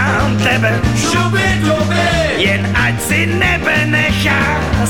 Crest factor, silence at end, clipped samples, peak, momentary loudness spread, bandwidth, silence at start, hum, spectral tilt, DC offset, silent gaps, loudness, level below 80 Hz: 12 dB; 0 s; under 0.1%; -2 dBFS; 2 LU; 18 kHz; 0 s; none; -5 dB/octave; 1%; none; -13 LUFS; -28 dBFS